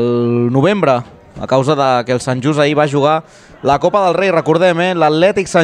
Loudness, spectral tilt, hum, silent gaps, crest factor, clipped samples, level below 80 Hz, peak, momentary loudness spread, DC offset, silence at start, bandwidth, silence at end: -13 LUFS; -6 dB/octave; none; none; 12 dB; under 0.1%; -48 dBFS; 0 dBFS; 5 LU; under 0.1%; 0 s; 11 kHz; 0 s